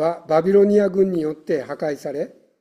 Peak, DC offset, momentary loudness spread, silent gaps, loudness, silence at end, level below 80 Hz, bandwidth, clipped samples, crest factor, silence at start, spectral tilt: -6 dBFS; under 0.1%; 13 LU; none; -20 LUFS; 0.3 s; -62 dBFS; 10.5 kHz; under 0.1%; 14 dB; 0 s; -8 dB/octave